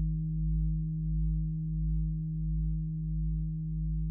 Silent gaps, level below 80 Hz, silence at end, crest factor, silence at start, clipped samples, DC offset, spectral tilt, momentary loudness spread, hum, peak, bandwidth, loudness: none; -34 dBFS; 0 s; 8 dB; 0 s; under 0.1%; under 0.1%; -15.5 dB/octave; 3 LU; none; -22 dBFS; 0.4 kHz; -34 LUFS